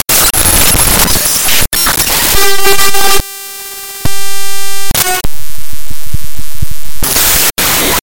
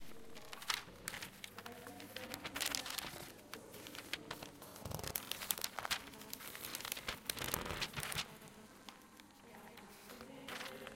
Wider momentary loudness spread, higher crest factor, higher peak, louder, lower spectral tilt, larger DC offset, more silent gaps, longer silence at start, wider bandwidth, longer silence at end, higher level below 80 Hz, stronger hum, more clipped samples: about the same, 16 LU vs 16 LU; second, 10 dB vs 34 dB; first, 0 dBFS vs -12 dBFS; first, -8 LUFS vs -44 LUFS; about the same, -1.5 dB/octave vs -1.5 dB/octave; neither; neither; about the same, 0 s vs 0 s; first, over 20 kHz vs 17 kHz; about the same, 0 s vs 0 s; first, -22 dBFS vs -66 dBFS; neither; first, 1% vs under 0.1%